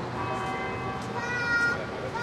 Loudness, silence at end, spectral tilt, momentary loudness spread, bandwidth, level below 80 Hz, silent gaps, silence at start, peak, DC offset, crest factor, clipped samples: -29 LUFS; 0 s; -5 dB/octave; 8 LU; 13.5 kHz; -52 dBFS; none; 0 s; -16 dBFS; under 0.1%; 14 dB; under 0.1%